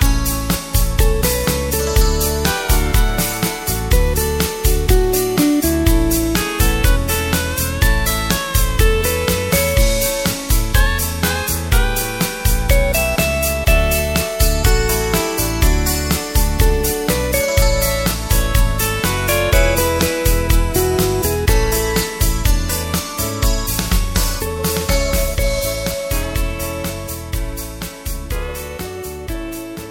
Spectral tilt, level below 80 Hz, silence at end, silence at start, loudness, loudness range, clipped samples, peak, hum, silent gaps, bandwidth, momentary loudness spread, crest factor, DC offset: -4 dB/octave; -20 dBFS; 0 s; 0 s; -17 LUFS; 4 LU; under 0.1%; 0 dBFS; none; none; 17 kHz; 8 LU; 16 dB; under 0.1%